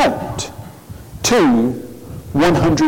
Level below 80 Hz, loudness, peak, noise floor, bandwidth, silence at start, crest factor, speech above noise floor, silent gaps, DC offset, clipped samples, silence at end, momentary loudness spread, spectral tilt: -38 dBFS; -16 LUFS; -8 dBFS; -35 dBFS; 17 kHz; 0 s; 8 dB; 22 dB; none; under 0.1%; under 0.1%; 0 s; 22 LU; -5 dB/octave